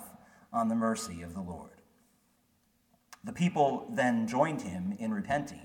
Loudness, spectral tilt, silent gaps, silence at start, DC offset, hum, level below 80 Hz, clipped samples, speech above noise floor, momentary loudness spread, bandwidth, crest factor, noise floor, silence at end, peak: -32 LUFS; -6 dB/octave; none; 0 s; under 0.1%; none; -64 dBFS; under 0.1%; 40 dB; 15 LU; 17 kHz; 20 dB; -71 dBFS; 0 s; -14 dBFS